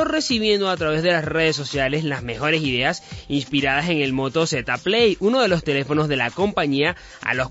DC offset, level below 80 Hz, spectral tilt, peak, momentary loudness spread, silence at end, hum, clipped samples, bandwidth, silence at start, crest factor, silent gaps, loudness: under 0.1%; -46 dBFS; -4.5 dB/octave; -6 dBFS; 6 LU; 0 s; none; under 0.1%; 8 kHz; 0 s; 16 dB; none; -20 LUFS